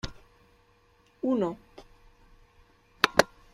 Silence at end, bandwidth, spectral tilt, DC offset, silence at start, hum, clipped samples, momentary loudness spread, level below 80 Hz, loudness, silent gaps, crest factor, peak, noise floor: 0.3 s; 14.5 kHz; -3.5 dB/octave; under 0.1%; 0.05 s; none; under 0.1%; 17 LU; -54 dBFS; -27 LUFS; none; 32 dB; -2 dBFS; -63 dBFS